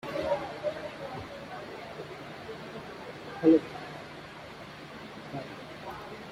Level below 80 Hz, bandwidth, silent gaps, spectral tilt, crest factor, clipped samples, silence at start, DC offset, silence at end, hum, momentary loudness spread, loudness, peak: -64 dBFS; 12.5 kHz; none; -6.5 dB/octave; 24 dB; under 0.1%; 0.05 s; under 0.1%; 0 s; none; 18 LU; -34 LUFS; -10 dBFS